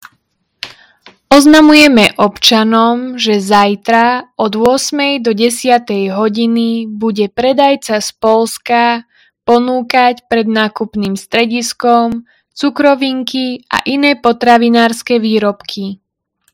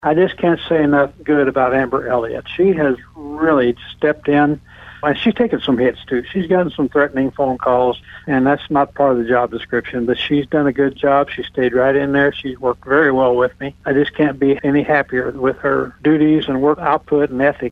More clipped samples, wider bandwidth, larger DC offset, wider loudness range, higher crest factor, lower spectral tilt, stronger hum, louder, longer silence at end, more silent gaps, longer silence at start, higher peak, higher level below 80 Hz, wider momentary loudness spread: first, 1% vs under 0.1%; first, 18.5 kHz vs 5 kHz; neither; first, 5 LU vs 1 LU; about the same, 12 dB vs 16 dB; second, -4 dB/octave vs -8.5 dB/octave; neither; first, -11 LUFS vs -16 LUFS; first, 0.6 s vs 0 s; neither; first, 0.65 s vs 0 s; about the same, 0 dBFS vs 0 dBFS; about the same, -48 dBFS vs -46 dBFS; first, 10 LU vs 6 LU